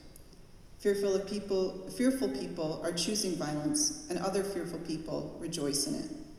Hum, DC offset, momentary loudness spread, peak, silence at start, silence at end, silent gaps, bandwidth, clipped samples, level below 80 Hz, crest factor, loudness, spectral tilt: none; under 0.1%; 8 LU; -16 dBFS; 0 s; 0 s; none; 15.5 kHz; under 0.1%; -56 dBFS; 16 dB; -33 LUFS; -3.5 dB/octave